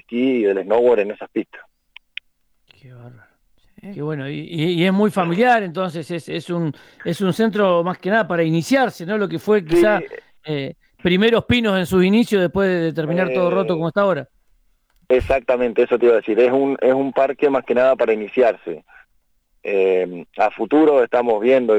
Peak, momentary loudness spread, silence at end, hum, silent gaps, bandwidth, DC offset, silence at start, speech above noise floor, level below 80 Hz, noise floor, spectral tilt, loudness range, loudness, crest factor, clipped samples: -6 dBFS; 12 LU; 0 s; none; none; 16 kHz; under 0.1%; 0.1 s; 45 dB; -48 dBFS; -63 dBFS; -6.5 dB/octave; 6 LU; -18 LUFS; 12 dB; under 0.1%